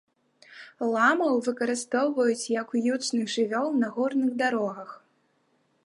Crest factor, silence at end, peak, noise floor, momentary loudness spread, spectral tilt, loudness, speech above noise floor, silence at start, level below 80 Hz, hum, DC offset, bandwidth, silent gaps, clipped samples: 18 dB; 0.9 s; -8 dBFS; -69 dBFS; 10 LU; -3.5 dB/octave; -26 LUFS; 43 dB; 0.5 s; -82 dBFS; none; under 0.1%; 11.5 kHz; none; under 0.1%